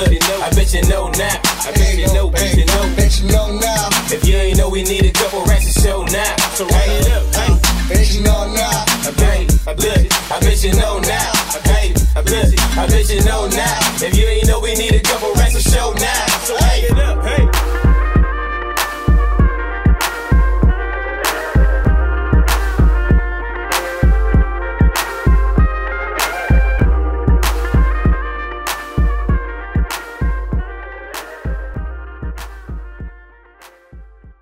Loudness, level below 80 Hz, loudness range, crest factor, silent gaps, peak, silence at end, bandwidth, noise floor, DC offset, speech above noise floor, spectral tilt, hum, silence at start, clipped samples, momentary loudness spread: -15 LUFS; -16 dBFS; 7 LU; 14 dB; none; 0 dBFS; 0.1 s; 16.5 kHz; -44 dBFS; under 0.1%; 31 dB; -4 dB/octave; none; 0 s; under 0.1%; 9 LU